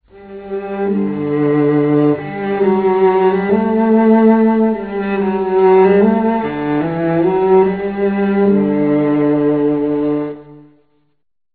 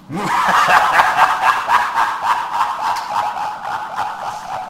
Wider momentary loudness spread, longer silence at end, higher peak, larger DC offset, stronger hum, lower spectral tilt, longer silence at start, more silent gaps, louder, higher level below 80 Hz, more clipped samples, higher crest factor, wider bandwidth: second, 9 LU vs 12 LU; first, 1 s vs 0 s; about the same, 0 dBFS vs 0 dBFS; neither; neither; first, -12 dB/octave vs -2.5 dB/octave; first, 0.15 s vs 0 s; neither; about the same, -14 LUFS vs -16 LUFS; about the same, -48 dBFS vs -52 dBFS; neither; about the same, 14 dB vs 16 dB; second, 4.6 kHz vs 16 kHz